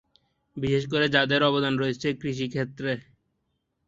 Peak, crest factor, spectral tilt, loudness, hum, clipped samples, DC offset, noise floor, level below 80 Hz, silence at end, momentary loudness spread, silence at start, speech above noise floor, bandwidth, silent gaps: -4 dBFS; 22 dB; -6 dB/octave; -25 LUFS; none; under 0.1%; under 0.1%; -76 dBFS; -58 dBFS; 0.85 s; 10 LU; 0.55 s; 51 dB; 7.8 kHz; none